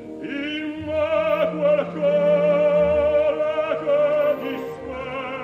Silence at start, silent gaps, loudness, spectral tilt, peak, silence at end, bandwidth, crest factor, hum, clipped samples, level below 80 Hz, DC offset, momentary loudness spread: 0 s; none; -21 LUFS; -7 dB/octave; -8 dBFS; 0 s; 6 kHz; 12 dB; none; under 0.1%; -50 dBFS; under 0.1%; 11 LU